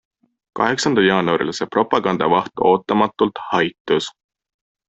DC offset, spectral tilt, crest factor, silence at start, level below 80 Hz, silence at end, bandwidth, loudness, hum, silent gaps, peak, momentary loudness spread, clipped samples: under 0.1%; -5 dB/octave; 18 dB; 0.55 s; -58 dBFS; 0.8 s; 8.2 kHz; -18 LUFS; none; 3.80-3.85 s; 0 dBFS; 5 LU; under 0.1%